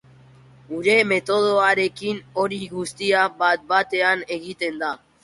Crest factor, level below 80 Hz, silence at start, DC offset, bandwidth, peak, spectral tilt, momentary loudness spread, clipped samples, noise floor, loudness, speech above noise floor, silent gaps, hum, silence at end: 18 dB; -64 dBFS; 0.7 s; under 0.1%; 11.5 kHz; -4 dBFS; -4 dB/octave; 11 LU; under 0.1%; -49 dBFS; -21 LUFS; 28 dB; none; none; 0.25 s